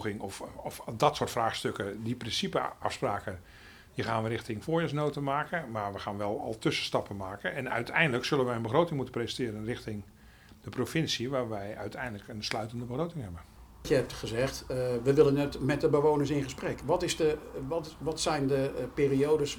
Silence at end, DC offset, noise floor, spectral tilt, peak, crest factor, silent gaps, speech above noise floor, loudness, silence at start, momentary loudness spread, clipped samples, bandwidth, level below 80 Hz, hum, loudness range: 0 s; under 0.1%; -55 dBFS; -5 dB/octave; -10 dBFS; 22 dB; none; 24 dB; -31 LUFS; 0 s; 12 LU; under 0.1%; 20 kHz; -54 dBFS; none; 6 LU